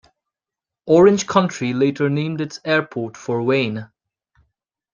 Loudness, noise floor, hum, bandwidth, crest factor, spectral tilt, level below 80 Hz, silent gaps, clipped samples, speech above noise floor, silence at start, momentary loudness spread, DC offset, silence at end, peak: -19 LUFS; -88 dBFS; none; 7.4 kHz; 20 dB; -6 dB/octave; -60 dBFS; none; under 0.1%; 70 dB; 0.85 s; 14 LU; under 0.1%; 1.1 s; 0 dBFS